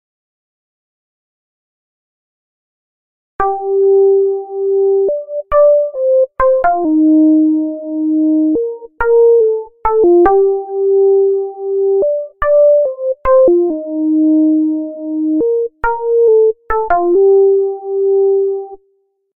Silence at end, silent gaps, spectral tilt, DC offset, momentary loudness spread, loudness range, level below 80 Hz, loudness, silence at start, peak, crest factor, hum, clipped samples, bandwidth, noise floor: 0.6 s; none; -10.5 dB/octave; under 0.1%; 9 LU; 3 LU; -40 dBFS; -13 LUFS; 3.4 s; -2 dBFS; 12 dB; none; under 0.1%; 3 kHz; -60 dBFS